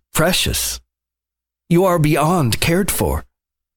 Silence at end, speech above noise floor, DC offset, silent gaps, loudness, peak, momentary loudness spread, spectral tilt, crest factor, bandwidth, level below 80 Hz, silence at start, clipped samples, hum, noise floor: 0.55 s; 70 dB; under 0.1%; none; -17 LUFS; -4 dBFS; 7 LU; -4.5 dB/octave; 14 dB; 19.5 kHz; -34 dBFS; 0.15 s; under 0.1%; none; -86 dBFS